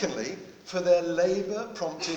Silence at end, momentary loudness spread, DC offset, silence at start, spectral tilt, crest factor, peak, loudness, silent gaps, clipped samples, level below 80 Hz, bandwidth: 0 s; 11 LU; under 0.1%; 0 s; -4 dB/octave; 18 dB; -10 dBFS; -28 LUFS; none; under 0.1%; -64 dBFS; 8.2 kHz